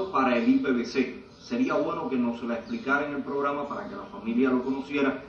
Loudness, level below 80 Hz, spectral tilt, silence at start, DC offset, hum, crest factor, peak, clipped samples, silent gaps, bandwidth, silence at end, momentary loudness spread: -27 LUFS; -62 dBFS; -6 dB/octave; 0 s; under 0.1%; none; 14 dB; -12 dBFS; under 0.1%; none; 6.8 kHz; 0 s; 11 LU